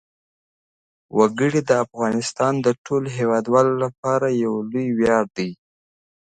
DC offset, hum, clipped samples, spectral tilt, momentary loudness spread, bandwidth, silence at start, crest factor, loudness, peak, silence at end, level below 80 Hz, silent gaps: under 0.1%; none; under 0.1%; -6 dB/octave; 6 LU; 9.4 kHz; 1.15 s; 20 dB; -21 LUFS; -2 dBFS; 0.85 s; -60 dBFS; 2.78-2.85 s, 3.98-4.03 s